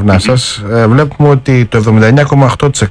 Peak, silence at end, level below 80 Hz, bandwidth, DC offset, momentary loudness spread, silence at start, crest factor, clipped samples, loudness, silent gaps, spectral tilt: 0 dBFS; 0 s; -32 dBFS; 10.5 kHz; under 0.1%; 4 LU; 0 s; 8 dB; under 0.1%; -8 LUFS; none; -6 dB/octave